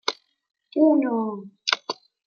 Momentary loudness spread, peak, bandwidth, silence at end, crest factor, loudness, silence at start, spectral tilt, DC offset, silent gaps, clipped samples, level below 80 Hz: 14 LU; -2 dBFS; 7 kHz; 0.35 s; 24 dB; -23 LUFS; 0.05 s; -3.5 dB/octave; under 0.1%; none; under 0.1%; -82 dBFS